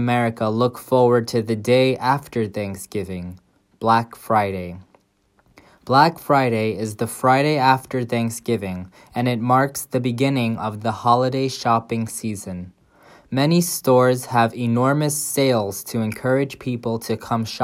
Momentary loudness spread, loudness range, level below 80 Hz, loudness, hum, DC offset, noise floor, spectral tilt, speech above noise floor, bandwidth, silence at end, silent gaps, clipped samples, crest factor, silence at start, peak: 12 LU; 3 LU; -60 dBFS; -20 LUFS; none; under 0.1%; -62 dBFS; -5.5 dB/octave; 42 dB; 16 kHz; 0 s; none; under 0.1%; 20 dB; 0 s; 0 dBFS